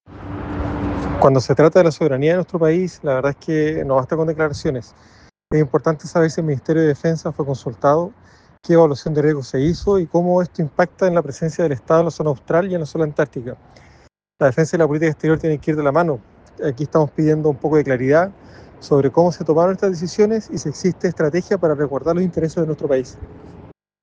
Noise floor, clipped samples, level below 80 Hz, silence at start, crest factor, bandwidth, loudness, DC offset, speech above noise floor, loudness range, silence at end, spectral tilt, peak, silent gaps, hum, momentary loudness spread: -52 dBFS; under 0.1%; -44 dBFS; 0.1 s; 18 dB; 9 kHz; -18 LUFS; under 0.1%; 34 dB; 3 LU; 0.35 s; -7.5 dB/octave; 0 dBFS; none; none; 9 LU